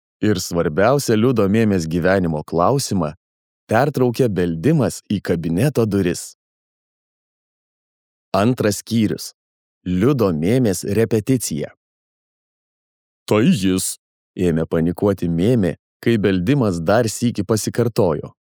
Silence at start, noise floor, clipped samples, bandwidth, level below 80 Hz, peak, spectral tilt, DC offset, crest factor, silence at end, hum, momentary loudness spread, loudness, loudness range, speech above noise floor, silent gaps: 0.2 s; under -90 dBFS; under 0.1%; 20 kHz; -48 dBFS; -2 dBFS; -6 dB/octave; under 0.1%; 16 dB; 0.3 s; none; 8 LU; -19 LUFS; 5 LU; over 73 dB; 3.17-3.67 s, 6.35-8.32 s, 9.34-9.81 s, 11.77-13.26 s, 13.99-14.34 s, 15.79-16.00 s